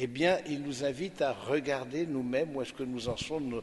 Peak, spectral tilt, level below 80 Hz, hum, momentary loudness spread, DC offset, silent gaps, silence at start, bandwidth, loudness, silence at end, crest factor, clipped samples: -14 dBFS; -5 dB/octave; -60 dBFS; none; 7 LU; under 0.1%; none; 0 s; 11.5 kHz; -33 LUFS; 0 s; 18 dB; under 0.1%